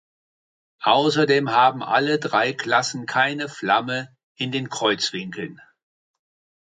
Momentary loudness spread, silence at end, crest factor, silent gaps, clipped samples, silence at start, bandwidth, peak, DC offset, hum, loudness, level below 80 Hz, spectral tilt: 12 LU; 1.15 s; 20 dB; 4.23-4.35 s; under 0.1%; 0.8 s; 9.4 kHz; -4 dBFS; under 0.1%; none; -21 LUFS; -72 dBFS; -4 dB/octave